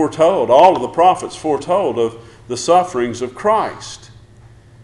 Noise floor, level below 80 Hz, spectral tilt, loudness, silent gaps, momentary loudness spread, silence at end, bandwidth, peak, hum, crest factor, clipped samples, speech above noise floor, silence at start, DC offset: -43 dBFS; -50 dBFS; -4.5 dB/octave; -15 LUFS; none; 15 LU; 0.75 s; 11.5 kHz; 0 dBFS; none; 16 dB; under 0.1%; 28 dB; 0 s; under 0.1%